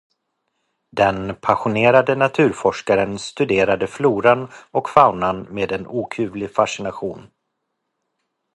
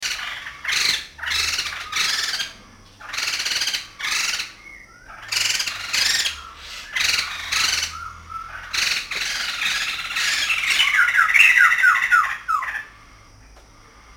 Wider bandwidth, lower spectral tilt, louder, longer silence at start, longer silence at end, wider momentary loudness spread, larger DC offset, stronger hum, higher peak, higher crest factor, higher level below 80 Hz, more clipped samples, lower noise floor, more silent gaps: second, 11.5 kHz vs 17 kHz; first, -5.5 dB/octave vs 2 dB/octave; about the same, -18 LUFS vs -19 LUFS; first, 0.95 s vs 0 s; first, 1.35 s vs 0.05 s; second, 11 LU vs 16 LU; neither; neither; about the same, 0 dBFS vs -2 dBFS; about the same, 20 dB vs 22 dB; about the same, -52 dBFS vs -50 dBFS; neither; first, -76 dBFS vs -48 dBFS; neither